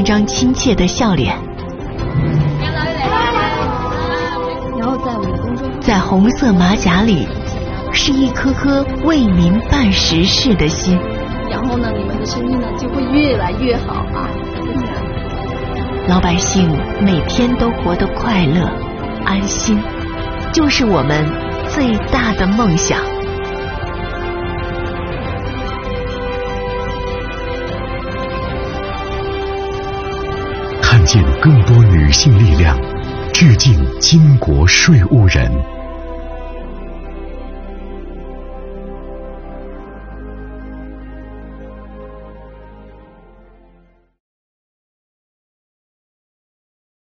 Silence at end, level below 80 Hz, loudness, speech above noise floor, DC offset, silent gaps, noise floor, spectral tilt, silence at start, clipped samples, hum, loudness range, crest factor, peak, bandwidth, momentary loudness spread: 4 s; -24 dBFS; -15 LUFS; 38 dB; under 0.1%; none; -50 dBFS; -5 dB/octave; 0 s; under 0.1%; none; 20 LU; 14 dB; 0 dBFS; 6.8 kHz; 21 LU